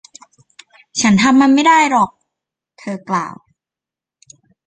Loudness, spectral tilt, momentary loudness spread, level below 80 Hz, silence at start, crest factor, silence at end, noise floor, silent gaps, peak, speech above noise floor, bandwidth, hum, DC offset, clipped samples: -13 LUFS; -4 dB/octave; 18 LU; -58 dBFS; 0.95 s; 16 dB; 1.35 s; -88 dBFS; none; -2 dBFS; 75 dB; 9.4 kHz; none; under 0.1%; under 0.1%